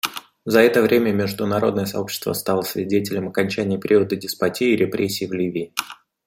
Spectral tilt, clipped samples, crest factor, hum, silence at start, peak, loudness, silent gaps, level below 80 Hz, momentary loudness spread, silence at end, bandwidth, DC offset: -5 dB/octave; under 0.1%; 20 dB; none; 0.05 s; -2 dBFS; -21 LUFS; none; -62 dBFS; 9 LU; 0.3 s; 16.5 kHz; under 0.1%